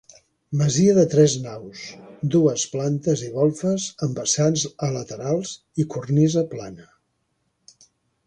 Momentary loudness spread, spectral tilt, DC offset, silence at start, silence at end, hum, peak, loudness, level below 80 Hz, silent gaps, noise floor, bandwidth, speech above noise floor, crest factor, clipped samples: 16 LU; -5.5 dB/octave; under 0.1%; 0.5 s; 1.45 s; none; -4 dBFS; -21 LUFS; -58 dBFS; none; -72 dBFS; 10.5 kHz; 51 dB; 18 dB; under 0.1%